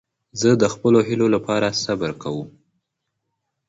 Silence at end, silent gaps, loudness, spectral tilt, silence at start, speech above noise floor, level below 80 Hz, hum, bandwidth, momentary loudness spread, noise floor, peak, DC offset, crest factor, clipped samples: 1.2 s; none; -20 LUFS; -5.5 dB/octave; 0.35 s; 59 dB; -56 dBFS; none; 8 kHz; 14 LU; -78 dBFS; -2 dBFS; under 0.1%; 18 dB; under 0.1%